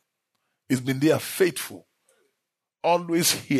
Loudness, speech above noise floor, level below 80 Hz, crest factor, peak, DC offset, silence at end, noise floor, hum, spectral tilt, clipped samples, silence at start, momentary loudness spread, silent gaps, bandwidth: -24 LUFS; 59 dB; -70 dBFS; 18 dB; -8 dBFS; under 0.1%; 0 s; -82 dBFS; none; -4 dB/octave; under 0.1%; 0.7 s; 8 LU; none; 13.5 kHz